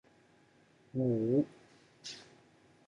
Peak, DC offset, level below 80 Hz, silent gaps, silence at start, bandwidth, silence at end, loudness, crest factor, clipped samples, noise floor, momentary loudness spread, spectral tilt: -18 dBFS; under 0.1%; -76 dBFS; none; 0.95 s; 10.5 kHz; 0.65 s; -35 LUFS; 20 dB; under 0.1%; -66 dBFS; 18 LU; -7.5 dB/octave